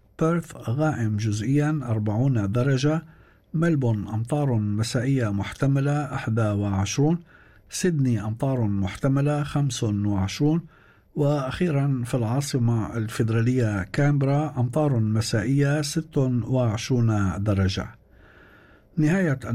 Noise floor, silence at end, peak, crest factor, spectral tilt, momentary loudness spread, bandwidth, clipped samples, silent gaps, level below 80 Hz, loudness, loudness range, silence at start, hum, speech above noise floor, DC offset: -53 dBFS; 0 s; -12 dBFS; 12 dB; -6.5 dB/octave; 4 LU; 13.5 kHz; under 0.1%; none; -52 dBFS; -24 LUFS; 2 LU; 0.2 s; none; 30 dB; under 0.1%